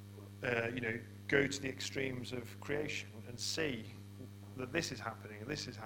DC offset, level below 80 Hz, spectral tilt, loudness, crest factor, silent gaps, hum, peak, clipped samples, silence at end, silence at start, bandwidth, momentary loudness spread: under 0.1%; -64 dBFS; -4 dB/octave; -39 LUFS; 26 dB; none; none; -14 dBFS; under 0.1%; 0 s; 0 s; 17.5 kHz; 16 LU